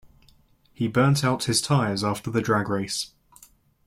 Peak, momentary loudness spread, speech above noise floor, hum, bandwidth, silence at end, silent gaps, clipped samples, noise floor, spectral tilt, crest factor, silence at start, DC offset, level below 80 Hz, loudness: -8 dBFS; 9 LU; 36 dB; none; 16 kHz; 0.8 s; none; under 0.1%; -59 dBFS; -5 dB/octave; 18 dB; 0.05 s; under 0.1%; -56 dBFS; -24 LUFS